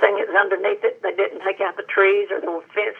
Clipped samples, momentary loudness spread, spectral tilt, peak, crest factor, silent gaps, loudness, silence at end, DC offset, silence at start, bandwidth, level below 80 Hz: under 0.1%; 8 LU; -4.5 dB/octave; 0 dBFS; 20 dB; none; -20 LUFS; 0 s; under 0.1%; 0 s; 4 kHz; under -90 dBFS